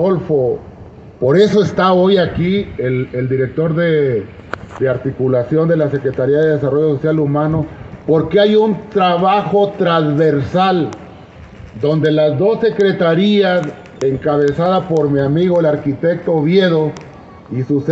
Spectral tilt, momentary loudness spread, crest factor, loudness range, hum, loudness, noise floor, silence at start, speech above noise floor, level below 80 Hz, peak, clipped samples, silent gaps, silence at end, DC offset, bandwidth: -8 dB/octave; 8 LU; 14 dB; 2 LU; none; -14 LUFS; -36 dBFS; 0 s; 23 dB; -46 dBFS; 0 dBFS; under 0.1%; none; 0 s; under 0.1%; 7.8 kHz